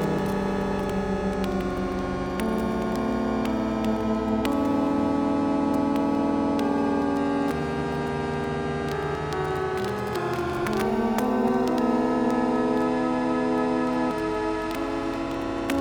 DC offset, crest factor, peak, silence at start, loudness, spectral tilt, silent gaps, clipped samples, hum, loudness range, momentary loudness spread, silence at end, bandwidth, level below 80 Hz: under 0.1%; 18 dB; -8 dBFS; 0 s; -26 LUFS; -6.5 dB/octave; none; under 0.1%; none; 3 LU; 5 LU; 0 s; 20 kHz; -44 dBFS